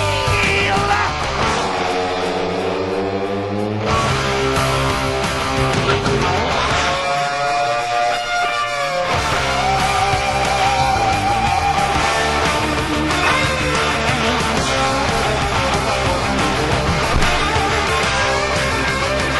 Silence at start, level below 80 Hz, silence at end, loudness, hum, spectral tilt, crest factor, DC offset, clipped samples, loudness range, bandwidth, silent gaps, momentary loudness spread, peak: 0 s; -30 dBFS; 0 s; -17 LUFS; none; -4 dB/octave; 16 dB; under 0.1%; under 0.1%; 2 LU; 12.5 kHz; none; 3 LU; -2 dBFS